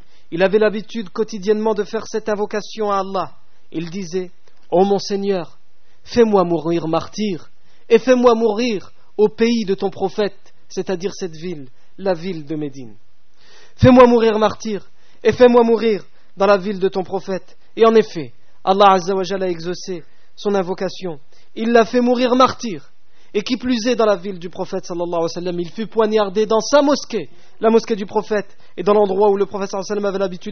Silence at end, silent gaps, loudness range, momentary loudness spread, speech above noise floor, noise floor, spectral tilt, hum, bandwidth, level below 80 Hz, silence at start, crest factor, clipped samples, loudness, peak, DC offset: 0 s; none; 7 LU; 15 LU; 35 dB; -52 dBFS; -4.5 dB/octave; none; 6.6 kHz; -48 dBFS; 0.3 s; 18 dB; under 0.1%; -18 LUFS; 0 dBFS; 3%